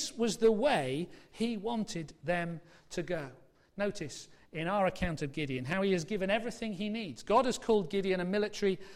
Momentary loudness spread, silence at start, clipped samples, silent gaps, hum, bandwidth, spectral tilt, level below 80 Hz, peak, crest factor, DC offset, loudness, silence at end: 13 LU; 0 s; under 0.1%; none; none; 14.5 kHz; -5 dB/octave; -56 dBFS; -16 dBFS; 16 dB; under 0.1%; -33 LUFS; 0 s